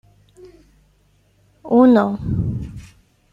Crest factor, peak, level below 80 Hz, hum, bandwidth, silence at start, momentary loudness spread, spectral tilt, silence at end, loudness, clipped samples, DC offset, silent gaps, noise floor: 18 dB; -2 dBFS; -40 dBFS; 50 Hz at -50 dBFS; 5.8 kHz; 0.45 s; 21 LU; -9.5 dB/octave; 0.5 s; -17 LUFS; under 0.1%; under 0.1%; none; -58 dBFS